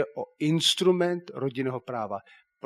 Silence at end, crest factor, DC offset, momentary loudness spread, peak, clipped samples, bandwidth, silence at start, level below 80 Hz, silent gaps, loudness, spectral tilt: 0.45 s; 18 dB; under 0.1%; 12 LU; -10 dBFS; under 0.1%; 13.5 kHz; 0 s; -76 dBFS; none; -27 LUFS; -4.5 dB/octave